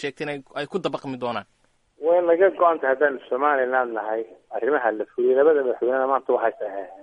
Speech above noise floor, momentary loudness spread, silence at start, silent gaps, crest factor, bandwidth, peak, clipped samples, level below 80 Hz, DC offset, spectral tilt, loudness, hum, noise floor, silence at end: 22 dB; 12 LU; 0 s; none; 18 dB; 9.2 kHz; -4 dBFS; under 0.1%; -70 dBFS; under 0.1%; -6.5 dB/octave; -22 LUFS; none; -45 dBFS; 0 s